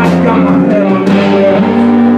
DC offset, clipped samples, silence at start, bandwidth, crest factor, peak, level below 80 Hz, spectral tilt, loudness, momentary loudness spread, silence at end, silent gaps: under 0.1%; 0.2%; 0 s; 9 kHz; 8 dB; 0 dBFS; -42 dBFS; -8 dB/octave; -8 LUFS; 1 LU; 0 s; none